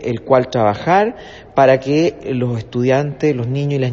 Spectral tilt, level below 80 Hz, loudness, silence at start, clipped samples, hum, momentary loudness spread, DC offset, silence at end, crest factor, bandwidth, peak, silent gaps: -7.5 dB/octave; -48 dBFS; -16 LUFS; 0 s; under 0.1%; none; 8 LU; under 0.1%; 0 s; 16 dB; 7.4 kHz; 0 dBFS; none